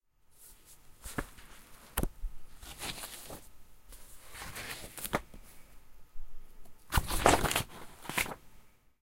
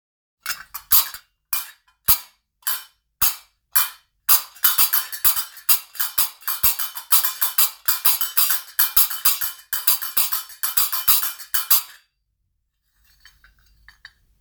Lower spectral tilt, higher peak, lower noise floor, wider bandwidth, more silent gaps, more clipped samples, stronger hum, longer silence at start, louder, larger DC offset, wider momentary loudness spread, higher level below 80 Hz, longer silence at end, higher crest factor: first, -3 dB/octave vs 2.5 dB/octave; second, -4 dBFS vs 0 dBFS; second, -59 dBFS vs -72 dBFS; second, 16.5 kHz vs over 20 kHz; neither; neither; neither; second, 0.3 s vs 0.45 s; second, -35 LUFS vs -18 LUFS; neither; first, 28 LU vs 10 LU; first, -44 dBFS vs -52 dBFS; second, 0.3 s vs 2.55 s; first, 32 dB vs 22 dB